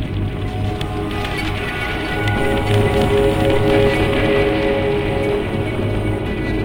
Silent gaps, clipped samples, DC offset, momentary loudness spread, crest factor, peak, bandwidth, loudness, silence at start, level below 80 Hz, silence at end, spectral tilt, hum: none; under 0.1%; under 0.1%; 8 LU; 14 dB; -2 dBFS; 17 kHz; -18 LUFS; 0 s; -28 dBFS; 0 s; -6.5 dB/octave; none